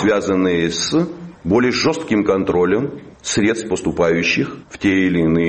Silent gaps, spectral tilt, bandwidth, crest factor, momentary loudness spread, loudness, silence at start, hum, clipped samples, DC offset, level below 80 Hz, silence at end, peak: none; -5 dB/octave; 8.8 kHz; 16 dB; 6 LU; -17 LUFS; 0 s; none; under 0.1%; under 0.1%; -44 dBFS; 0 s; -2 dBFS